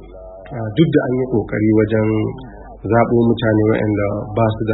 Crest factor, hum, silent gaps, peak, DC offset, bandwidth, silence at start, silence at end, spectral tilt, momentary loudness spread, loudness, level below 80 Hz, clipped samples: 16 dB; none; none; 0 dBFS; under 0.1%; 4.1 kHz; 0 s; 0 s; -13 dB/octave; 16 LU; -17 LUFS; -40 dBFS; under 0.1%